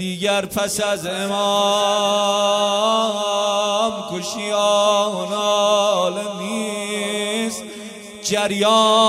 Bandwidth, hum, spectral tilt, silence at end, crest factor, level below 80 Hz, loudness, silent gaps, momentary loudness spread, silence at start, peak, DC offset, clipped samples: 15.5 kHz; none; -2.5 dB/octave; 0 s; 16 dB; -62 dBFS; -19 LUFS; none; 9 LU; 0 s; -4 dBFS; under 0.1%; under 0.1%